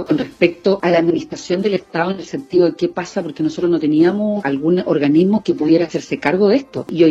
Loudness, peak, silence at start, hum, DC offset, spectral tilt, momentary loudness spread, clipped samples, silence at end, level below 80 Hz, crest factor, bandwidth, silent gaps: -17 LUFS; 0 dBFS; 0 s; none; under 0.1%; -7 dB/octave; 8 LU; under 0.1%; 0 s; -56 dBFS; 16 dB; 8 kHz; none